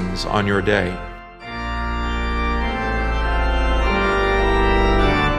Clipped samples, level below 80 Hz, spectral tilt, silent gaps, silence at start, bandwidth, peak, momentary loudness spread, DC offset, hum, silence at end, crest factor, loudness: under 0.1%; -24 dBFS; -6 dB/octave; none; 0 s; 9.4 kHz; -2 dBFS; 10 LU; under 0.1%; none; 0 s; 18 dB; -20 LUFS